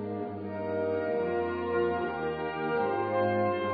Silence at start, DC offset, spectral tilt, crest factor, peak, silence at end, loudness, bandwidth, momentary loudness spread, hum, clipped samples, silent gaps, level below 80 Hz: 0 s; under 0.1%; -5 dB/octave; 14 dB; -16 dBFS; 0 s; -31 LUFS; 5 kHz; 7 LU; none; under 0.1%; none; -60 dBFS